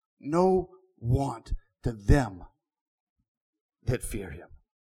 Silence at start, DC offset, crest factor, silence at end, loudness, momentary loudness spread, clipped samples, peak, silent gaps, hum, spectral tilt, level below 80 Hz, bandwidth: 0.25 s; under 0.1%; 22 dB; 0.35 s; -29 LUFS; 18 LU; under 0.1%; -8 dBFS; 2.81-3.16 s, 3.28-3.53 s, 3.61-3.69 s; none; -7.5 dB/octave; -36 dBFS; 15 kHz